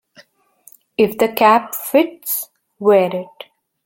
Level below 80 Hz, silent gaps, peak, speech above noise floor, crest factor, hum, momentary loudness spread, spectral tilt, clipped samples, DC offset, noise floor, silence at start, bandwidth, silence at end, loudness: -62 dBFS; none; 0 dBFS; 36 dB; 18 dB; none; 15 LU; -4.5 dB/octave; under 0.1%; under 0.1%; -51 dBFS; 1 s; 17 kHz; 0.6 s; -16 LUFS